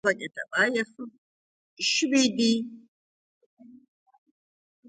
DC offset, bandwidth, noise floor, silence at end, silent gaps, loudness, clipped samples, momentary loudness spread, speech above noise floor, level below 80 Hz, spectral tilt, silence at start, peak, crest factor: under 0.1%; 9.6 kHz; under -90 dBFS; 1.15 s; 1.18-1.77 s, 2.88-3.57 s; -25 LUFS; under 0.1%; 17 LU; over 64 dB; -76 dBFS; -2.5 dB/octave; 0.05 s; -8 dBFS; 20 dB